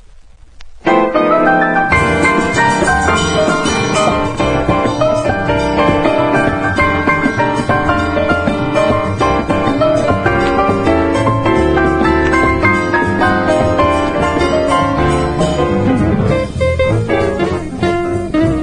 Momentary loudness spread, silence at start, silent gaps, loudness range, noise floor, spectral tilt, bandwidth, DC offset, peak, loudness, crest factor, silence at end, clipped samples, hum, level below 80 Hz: 3 LU; 0.1 s; none; 2 LU; -38 dBFS; -6 dB/octave; 10.5 kHz; under 0.1%; 0 dBFS; -13 LUFS; 12 dB; 0 s; under 0.1%; none; -30 dBFS